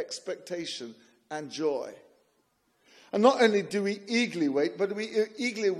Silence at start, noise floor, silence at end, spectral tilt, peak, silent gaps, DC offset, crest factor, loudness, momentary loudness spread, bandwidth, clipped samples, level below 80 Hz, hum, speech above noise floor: 0 s; -72 dBFS; 0 s; -4.5 dB/octave; -8 dBFS; none; under 0.1%; 22 dB; -28 LUFS; 15 LU; 13 kHz; under 0.1%; -84 dBFS; none; 43 dB